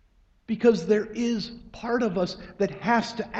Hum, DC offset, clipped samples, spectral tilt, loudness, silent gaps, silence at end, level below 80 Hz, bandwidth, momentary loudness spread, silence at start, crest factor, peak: none; under 0.1%; under 0.1%; -6 dB/octave; -26 LUFS; none; 0 s; -54 dBFS; 8 kHz; 10 LU; 0.5 s; 20 dB; -6 dBFS